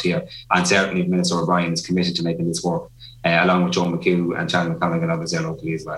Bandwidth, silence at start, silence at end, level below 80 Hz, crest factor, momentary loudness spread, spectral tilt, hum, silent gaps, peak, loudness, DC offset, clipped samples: 12 kHz; 0 s; 0 s; -54 dBFS; 20 dB; 8 LU; -5 dB/octave; none; none; 0 dBFS; -20 LUFS; under 0.1%; under 0.1%